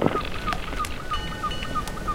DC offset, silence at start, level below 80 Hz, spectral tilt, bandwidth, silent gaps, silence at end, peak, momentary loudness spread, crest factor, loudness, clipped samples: under 0.1%; 0 s; -34 dBFS; -4.5 dB/octave; 16.5 kHz; none; 0 s; -2 dBFS; 3 LU; 26 dB; -29 LUFS; under 0.1%